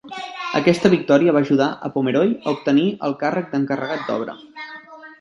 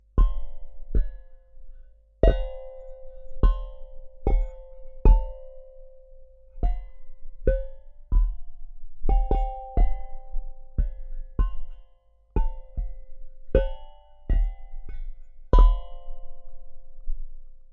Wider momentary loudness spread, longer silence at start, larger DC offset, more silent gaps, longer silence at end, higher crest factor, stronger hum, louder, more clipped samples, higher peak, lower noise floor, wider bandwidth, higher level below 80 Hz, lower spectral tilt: second, 17 LU vs 24 LU; about the same, 0.05 s vs 0.15 s; neither; neither; about the same, 0.05 s vs 0.15 s; about the same, 18 dB vs 22 dB; second, none vs 50 Hz at -55 dBFS; first, -19 LUFS vs -29 LUFS; neither; first, 0 dBFS vs -4 dBFS; second, -39 dBFS vs -56 dBFS; first, 11.5 kHz vs 3.9 kHz; second, -62 dBFS vs -26 dBFS; second, -6.5 dB/octave vs -9.5 dB/octave